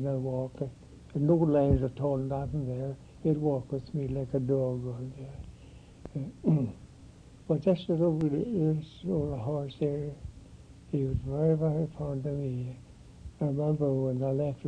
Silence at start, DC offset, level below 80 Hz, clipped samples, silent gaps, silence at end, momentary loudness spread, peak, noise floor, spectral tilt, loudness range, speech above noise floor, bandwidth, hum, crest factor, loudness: 0 s; under 0.1%; -50 dBFS; under 0.1%; none; 0 s; 14 LU; -12 dBFS; -52 dBFS; -10 dB/octave; 4 LU; 22 dB; 9.2 kHz; none; 18 dB; -31 LUFS